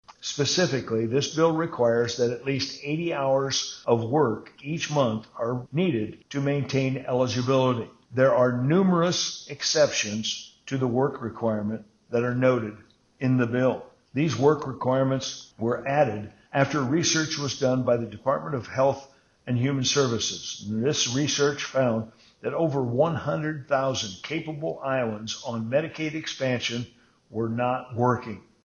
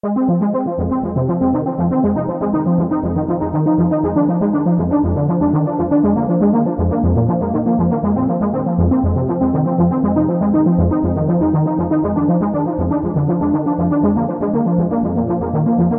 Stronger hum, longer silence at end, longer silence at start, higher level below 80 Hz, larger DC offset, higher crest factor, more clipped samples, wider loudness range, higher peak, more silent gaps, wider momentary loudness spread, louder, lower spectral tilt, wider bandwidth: neither; first, 0.25 s vs 0 s; about the same, 0.1 s vs 0.05 s; second, -62 dBFS vs -34 dBFS; neither; first, 18 dB vs 12 dB; neither; first, 4 LU vs 1 LU; second, -8 dBFS vs -2 dBFS; neither; first, 9 LU vs 3 LU; second, -26 LUFS vs -16 LUFS; second, -4.5 dB/octave vs -15 dB/octave; first, 7.4 kHz vs 2.4 kHz